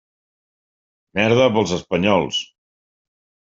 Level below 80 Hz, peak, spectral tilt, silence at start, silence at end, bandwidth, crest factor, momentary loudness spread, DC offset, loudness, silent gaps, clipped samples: -54 dBFS; -2 dBFS; -5 dB/octave; 1.15 s; 1.1 s; 7.8 kHz; 20 dB; 11 LU; under 0.1%; -18 LUFS; none; under 0.1%